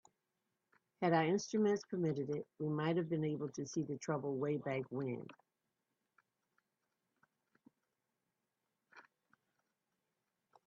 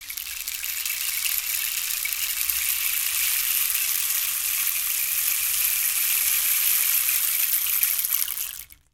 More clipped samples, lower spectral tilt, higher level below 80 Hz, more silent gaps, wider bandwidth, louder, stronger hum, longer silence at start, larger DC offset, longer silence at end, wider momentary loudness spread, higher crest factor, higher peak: neither; first, -6.5 dB/octave vs 4 dB/octave; second, -84 dBFS vs -58 dBFS; neither; second, 7.2 kHz vs 19 kHz; second, -38 LUFS vs -21 LUFS; neither; first, 1 s vs 0 s; neither; first, 1.65 s vs 0.2 s; about the same, 8 LU vs 7 LU; about the same, 22 dB vs 24 dB; second, -18 dBFS vs 0 dBFS